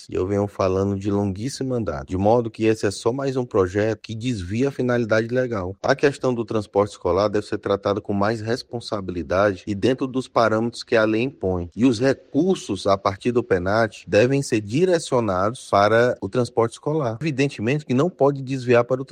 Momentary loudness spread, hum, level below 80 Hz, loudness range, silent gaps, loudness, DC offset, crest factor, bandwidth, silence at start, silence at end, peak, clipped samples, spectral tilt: 7 LU; none; -56 dBFS; 3 LU; none; -22 LUFS; under 0.1%; 18 dB; 11 kHz; 0 s; 0.05 s; -4 dBFS; under 0.1%; -6.5 dB/octave